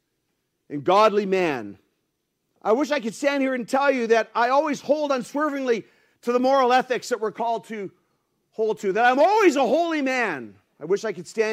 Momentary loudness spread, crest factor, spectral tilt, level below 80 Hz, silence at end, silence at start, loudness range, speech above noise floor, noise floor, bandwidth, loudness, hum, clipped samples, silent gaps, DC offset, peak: 14 LU; 18 dB; -4.5 dB/octave; -74 dBFS; 0 s; 0.7 s; 2 LU; 54 dB; -75 dBFS; 15.5 kHz; -22 LUFS; none; under 0.1%; none; under 0.1%; -4 dBFS